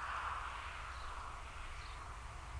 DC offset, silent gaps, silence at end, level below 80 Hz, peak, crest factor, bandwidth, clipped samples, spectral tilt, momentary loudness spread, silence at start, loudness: under 0.1%; none; 0 s; -52 dBFS; -30 dBFS; 16 dB; 10.5 kHz; under 0.1%; -3 dB/octave; 8 LU; 0 s; -46 LUFS